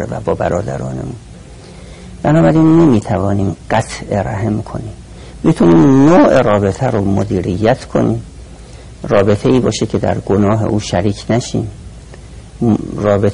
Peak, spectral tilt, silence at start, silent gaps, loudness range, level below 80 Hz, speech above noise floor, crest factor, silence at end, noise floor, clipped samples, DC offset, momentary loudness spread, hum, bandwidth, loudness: -2 dBFS; -7 dB/octave; 0 s; none; 4 LU; -34 dBFS; 22 dB; 12 dB; 0 s; -34 dBFS; under 0.1%; under 0.1%; 18 LU; none; 11 kHz; -13 LUFS